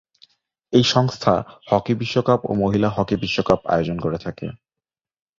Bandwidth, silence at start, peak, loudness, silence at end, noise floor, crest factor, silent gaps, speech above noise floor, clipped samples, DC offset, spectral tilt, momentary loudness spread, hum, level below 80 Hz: 7.6 kHz; 0.7 s; -2 dBFS; -20 LUFS; 0.85 s; -88 dBFS; 20 dB; none; 69 dB; under 0.1%; under 0.1%; -6 dB/octave; 8 LU; none; -48 dBFS